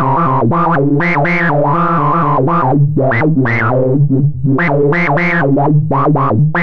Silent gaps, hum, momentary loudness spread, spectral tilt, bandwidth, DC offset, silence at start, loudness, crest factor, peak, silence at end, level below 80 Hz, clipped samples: none; none; 1 LU; -10 dB/octave; 5.4 kHz; under 0.1%; 0 s; -12 LUFS; 8 dB; -4 dBFS; 0 s; -40 dBFS; under 0.1%